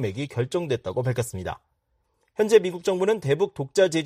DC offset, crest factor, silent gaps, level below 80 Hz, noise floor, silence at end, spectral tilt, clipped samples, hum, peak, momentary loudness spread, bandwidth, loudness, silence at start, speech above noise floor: under 0.1%; 20 dB; none; -58 dBFS; -72 dBFS; 0 s; -5.5 dB/octave; under 0.1%; none; -6 dBFS; 14 LU; 15 kHz; -24 LUFS; 0 s; 48 dB